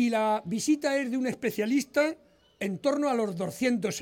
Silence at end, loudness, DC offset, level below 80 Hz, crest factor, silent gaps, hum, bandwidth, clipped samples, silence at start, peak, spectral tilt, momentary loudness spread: 0 s; -28 LUFS; under 0.1%; -70 dBFS; 16 dB; none; none; 17 kHz; under 0.1%; 0 s; -12 dBFS; -4.5 dB/octave; 5 LU